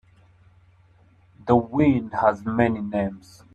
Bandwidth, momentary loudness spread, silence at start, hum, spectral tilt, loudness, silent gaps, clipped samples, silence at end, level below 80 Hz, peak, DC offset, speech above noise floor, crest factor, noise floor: 8.8 kHz; 10 LU; 1.45 s; none; -9 dB/octave; -22 LUFS; none; under 0.1%; 0.35 s; -54 dBFS; -4 dBFS; under 0.1%; 34 dB; 22 dB; -56 dBFS